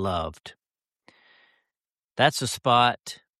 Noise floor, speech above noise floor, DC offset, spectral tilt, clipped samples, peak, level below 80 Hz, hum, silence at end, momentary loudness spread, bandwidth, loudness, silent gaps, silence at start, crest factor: under -90 dBFS; over 66 dB; under 0.1%; -3.5 dB/octave; under 0.1%; -6 dBFS; -56 dBFS; none; 0.25 s; 22 LU; 13.5 kHz; -23 LUFS; 2.04-2.09 s; 0 s; 22 dB